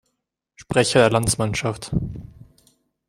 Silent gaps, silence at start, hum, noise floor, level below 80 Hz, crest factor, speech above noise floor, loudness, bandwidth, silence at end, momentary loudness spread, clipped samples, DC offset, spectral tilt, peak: none; 0.6 s; none; -77 dBFS; -42 dBFS; 20 dB; 58 dB; -20 LUFS; 16 kHz; 0.85 s; 13 LU; under 0.1%; under 0.1%; -4.5 dB/octave; -2 dBFS